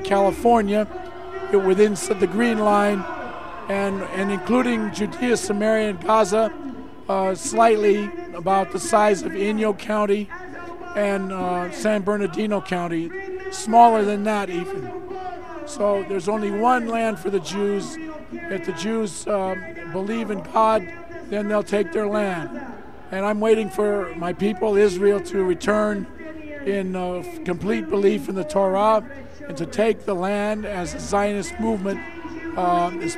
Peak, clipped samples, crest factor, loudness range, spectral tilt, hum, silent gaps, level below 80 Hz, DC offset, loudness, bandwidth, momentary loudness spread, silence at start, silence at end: -2 dBFS; under 0.1%; 20 dB; 4 LU; -5.5 dB/octave; none; none; -50 dBFS; 1%; -22 LUFS; 14 kHz; 15 LU; 0 s; 0 s